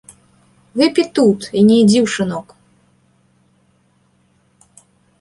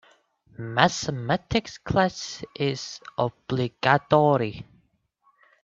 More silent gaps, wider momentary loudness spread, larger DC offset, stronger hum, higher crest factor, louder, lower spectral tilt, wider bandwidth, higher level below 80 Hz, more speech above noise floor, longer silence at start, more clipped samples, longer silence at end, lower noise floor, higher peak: neither; about the same, 12 LU vs 14 LU; neither; neither; second, 16 dB vs 24 dB; first, -14 LUFS vs -25 LUFS; about the same, -5.5 dB/octave vs -5 dB/octave; first, 11.5 kHz vs 7.8 kHz; second, -58 dBFS vs -52 dBFS; about the same, 45 dB vs 42 dB; first, 0.75 s vs 0.6 s; neither; first, 2.8 s vs 1 s; second, -58 dBFS vs -67 dBFS; about the same, -2 dBFS vs -2 dBFS